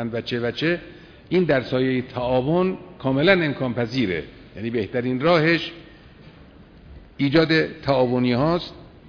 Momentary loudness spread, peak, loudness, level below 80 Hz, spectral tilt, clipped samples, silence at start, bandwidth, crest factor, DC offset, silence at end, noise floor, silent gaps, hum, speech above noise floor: 10 LU; -2 dBFS; -22 LUFS; -48 dBFS; -7.5 dB/octave; under 0.1%; 0 s; 5.4 kHz; 20 dB; under 0.1%; 0.25 s; -47 dBFS; none; none; 25 dB